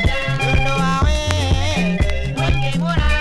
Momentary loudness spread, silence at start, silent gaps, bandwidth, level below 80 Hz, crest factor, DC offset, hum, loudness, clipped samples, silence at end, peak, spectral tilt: 2 LU; 0 s; none; 12.5 kHz; -22 dBFS; 16 dB; under 0.1%; none; -18 LUFS; under 0.1%; 0 s; 0 dBFS; -5.5 dB/octave